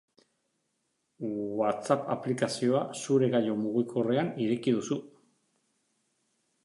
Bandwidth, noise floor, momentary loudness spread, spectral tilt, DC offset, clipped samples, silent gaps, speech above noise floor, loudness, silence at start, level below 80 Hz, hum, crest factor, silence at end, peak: 11.5 kHz; -78 dBFS; 8 LU; -6 dB/octave; under 0.1%; under 0.1%; none; 50 dB; -30 LUFS; 1.2 s; -76 dBFS; none; 22 dB; 1.55 s; -10 dBFS